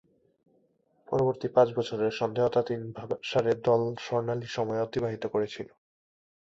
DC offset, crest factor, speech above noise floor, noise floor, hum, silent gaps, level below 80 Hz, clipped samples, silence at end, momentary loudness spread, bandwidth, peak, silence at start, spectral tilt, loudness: under 0.1%; 20 dB; 41 dB; -69 dBFS; none; none; -64 dBFS; under 0.1%; 0.85 s; 10 LU; 7.8 kHz; -10 dBFS; 1.1 s; -6.5 dB/octave; -29 LUFS